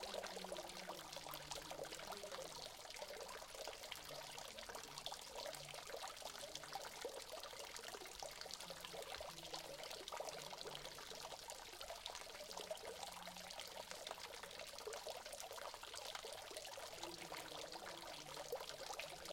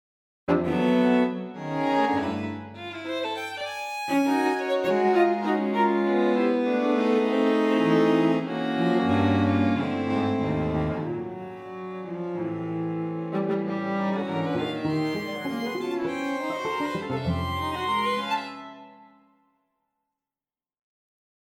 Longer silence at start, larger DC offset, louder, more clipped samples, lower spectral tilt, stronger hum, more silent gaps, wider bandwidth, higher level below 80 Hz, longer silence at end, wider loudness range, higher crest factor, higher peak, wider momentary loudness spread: second, 0 s vs 0.5 s; neither; second, -51 LUFS vs -25 LUFS; neither; second, -1 dB/octave vs -7 dB/octave; neither; neither; about the same, 17 kHz vs 16.5 kHz; second, -74 dBFS vs -54 dBFS; second, 0 s vs 2.45 s; second, 1 LU vs 7 LU; first, 26 dB vs 16 dB; second, -26 dBFS vs -10 dBFS; second, 2 LU vs 10 LU